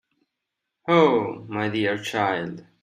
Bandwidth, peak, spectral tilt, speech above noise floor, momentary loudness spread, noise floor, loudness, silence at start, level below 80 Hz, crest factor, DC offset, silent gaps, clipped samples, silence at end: 15 kHz; -4 dBFS; -6 dB/octave; 60 dB; 12 LU; -82 dBFS; -23 LUFS; 0.85 s; -68 dBFS; 20 dB; under 0.1%; none; under 0.1%; 0.2 s